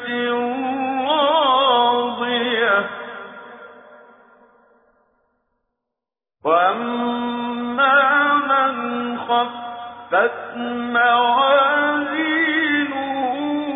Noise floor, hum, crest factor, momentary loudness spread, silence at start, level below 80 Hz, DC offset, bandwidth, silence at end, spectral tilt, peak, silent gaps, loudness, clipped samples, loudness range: -86 dBFS; none; 16 dB; 12 LU; 0 s; -70 dBFS; under 0.1%; 3.9 kHz; 0 s; -6.5 dB/octave; -4 dBFS; none; -18 LUFS; under 0.1%; 7 LU